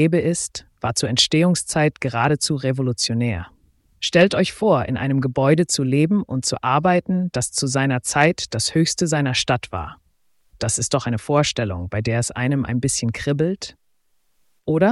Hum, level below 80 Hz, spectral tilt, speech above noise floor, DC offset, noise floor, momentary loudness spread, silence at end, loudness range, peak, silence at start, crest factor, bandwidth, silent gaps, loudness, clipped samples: none; -48 dBFS; -4.5 dB/octave; 44 dB; under 0.1%; -63 dBFS; 8 LU; 0 s; 3 LU; -2 dBFS; 0 s; 18 dB; 12 kHz; none; -20 LUFS; under 0.1%